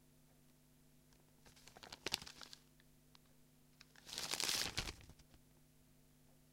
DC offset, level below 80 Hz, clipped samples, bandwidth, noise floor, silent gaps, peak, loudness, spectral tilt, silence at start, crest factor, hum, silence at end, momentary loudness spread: under 0.1%; -66 dBFS; under 0.1%; 16.5 kHz; -69 dBFS; none; -14 dBFS; -43 LUFS; -1 dB/octave; 0.15 s; 36 dB; none; 0.15 s; 28 LU